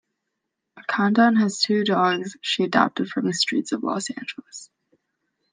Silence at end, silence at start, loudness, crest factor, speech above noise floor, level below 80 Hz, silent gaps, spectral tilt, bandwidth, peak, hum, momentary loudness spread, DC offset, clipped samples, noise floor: 0.85 s; 0.75 s; -22 LUFS; 20 dB; 58 dB; -74 dBFS; none; -4 dB/octave; 9.8 kHz; -4 dBFS; none; 16 LU; under 0.1%; under 0.1%; -80 dBFS